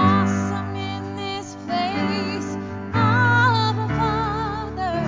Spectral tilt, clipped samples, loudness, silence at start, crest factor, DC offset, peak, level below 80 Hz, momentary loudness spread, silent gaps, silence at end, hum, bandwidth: -6 dB/octave; under 0.1%; -22 LUFS; 0 s; 16 dB; under 0.1%; -6 dBFS; -40 dBFS; 12 LU; none; 0 s; none; 7.6 kHz